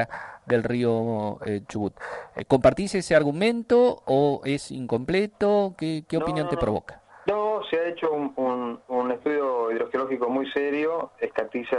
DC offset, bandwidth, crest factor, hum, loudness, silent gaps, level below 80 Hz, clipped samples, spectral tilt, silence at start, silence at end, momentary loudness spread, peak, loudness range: under 0.1%; 11.5 kHz; 18 dB; none; -25 LUFS; none; -52 dBFS; under 0.1%; -6.5 dB/octave; 0 s; 0 s; 10 LU; -8 dBFS; 4 LU